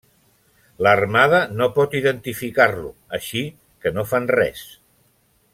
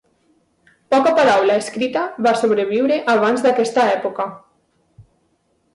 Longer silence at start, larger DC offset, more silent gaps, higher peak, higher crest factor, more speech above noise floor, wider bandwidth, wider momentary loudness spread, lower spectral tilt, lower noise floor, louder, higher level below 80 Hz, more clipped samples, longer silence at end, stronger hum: about the same, 0.8 s vs 0.9 s; neither; neither; first, -2 dBFS vs -6 dBFS; first, 20 dB vs 14 dB; second, 42 dB vs 48 dB; first, 16.5 kHz vs 11.5 kHz; first, 14 LU vs 8 LU; about the same, -5 dB/octave vs -4.5 dB/octave; about the same, -61 dBFS vs -64 dBFS; about the same, -19 LUFS vs -17 LUFS; first, -54 dBFS vs -64 dBFS; neither; second, 0.85 s vs 1.35 s; neither